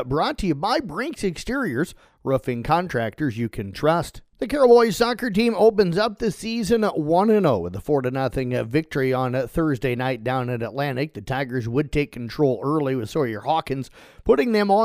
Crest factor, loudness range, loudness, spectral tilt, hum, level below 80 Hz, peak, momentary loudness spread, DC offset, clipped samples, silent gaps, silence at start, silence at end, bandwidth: 18 dB; 5 LU; -22 LUFS; -6.5 dB/octave; none; -44 dBFS; -4 dBFS; 10 LU; under 0.1%; under 0.1%; none; 0 s; 0 s; 15.5 kHz